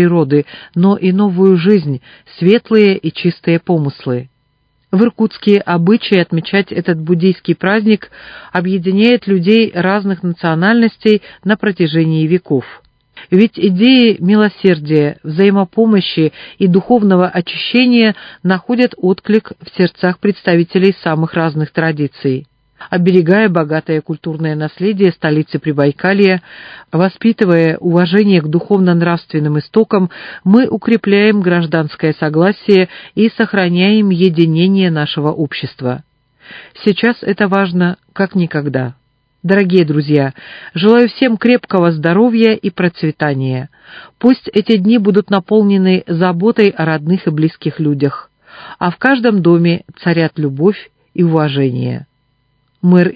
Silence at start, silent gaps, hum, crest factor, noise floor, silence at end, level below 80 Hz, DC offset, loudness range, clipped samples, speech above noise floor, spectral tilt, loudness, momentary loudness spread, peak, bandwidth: 0 s; none; none; 12 dB; -60 dBFS; 0 s; -56 dBFS; under 0.1%; 3 LU; 0.2%; 48 dB; -9.5 dB/octave; -13 LUFS; 8 LU; 0 dBFS; 5.2 kHz